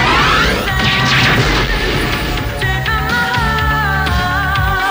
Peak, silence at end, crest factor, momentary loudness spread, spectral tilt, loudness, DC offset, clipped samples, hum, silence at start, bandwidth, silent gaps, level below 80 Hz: -2 dBFS; 0 s; 12 dB; 6 LU; -4.5 dB/octave; -13 LUFS; under 0.1%; under 0.1%; none; 0 s; 16 kHz; none; -22 dBFS